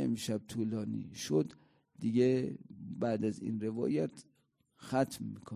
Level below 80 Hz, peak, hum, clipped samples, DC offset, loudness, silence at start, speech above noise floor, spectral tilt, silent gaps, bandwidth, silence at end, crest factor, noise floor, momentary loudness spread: -70 dBFS; -18 dBFS; none; under 0.1%; under 0.1%; -35 LUFS; 0 s; 40 dB; -6.5 dB/octave; none; 15.5 kHz; 0 s; 18 dB; -75 dBFS; 11 LU